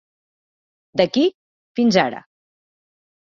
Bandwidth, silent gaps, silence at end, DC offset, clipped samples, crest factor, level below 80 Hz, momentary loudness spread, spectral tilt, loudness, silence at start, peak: 7.4 kHz; 1.34-1.75 s; 1.05 s; under 0.1%; under 0.1%; 22 dB; -64 dBFS; 12 LU; -5.5 dB/octave; -19 LUFS; 0.95 s; -2 dBFS